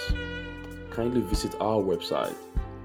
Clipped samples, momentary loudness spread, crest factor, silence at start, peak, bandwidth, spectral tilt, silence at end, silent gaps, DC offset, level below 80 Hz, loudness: under 0.1%; 10 LU; 16 dB; 0 s; -14 dBFS; 17.5 kHz; -5.5 dB/octave; 0 s; none; under 0.1%; -36 dBFS; -30 LUFS